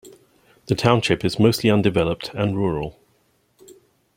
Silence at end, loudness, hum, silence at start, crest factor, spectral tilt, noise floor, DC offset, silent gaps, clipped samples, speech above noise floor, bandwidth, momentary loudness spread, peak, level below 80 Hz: 0.45 s; -20 LUFS; none; 0.05 s; 20 dB; -6 dB/octave; -63 dBFS; under 0.1%; none; under 0.1%; 44 dB; 16.5 kHz; 8 LU; -2 dBFS; -48 dBFS